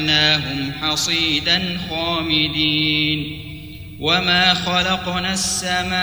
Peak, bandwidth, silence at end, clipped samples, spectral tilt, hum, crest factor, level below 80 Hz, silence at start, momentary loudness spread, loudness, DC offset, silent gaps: -2 dBFS; over 20 kHz; 0 s; under 0.1%; -3 dB/octave; none; 18 dB; -42 dBFS; 0 s; 10 LU; -17 LUFS; 0.3%; none